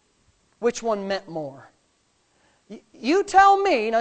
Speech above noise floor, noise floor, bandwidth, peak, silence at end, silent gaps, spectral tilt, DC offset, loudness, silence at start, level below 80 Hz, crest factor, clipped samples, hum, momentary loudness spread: 45 dB; -66 dBFS; 9 kHz; -4 dBFS; 0 s; none; -4 dB/octave; under 0.1%; -21 LUFS; 0.6 s; -58 dBFS; 20 dB; under 0.1%; none; 18 LU